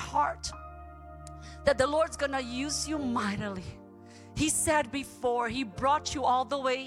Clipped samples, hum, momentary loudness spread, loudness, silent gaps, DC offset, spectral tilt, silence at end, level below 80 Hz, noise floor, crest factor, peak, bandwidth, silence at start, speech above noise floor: under 0.1%; none; 19 LU; -30 LUFS; none; under 0.1%; -3.5 dB/octave; 0 s; -50 dBFS; -50 dBFS; 18 dB; -12 dBFS; 16.5 kHz; 0 s; 21 dB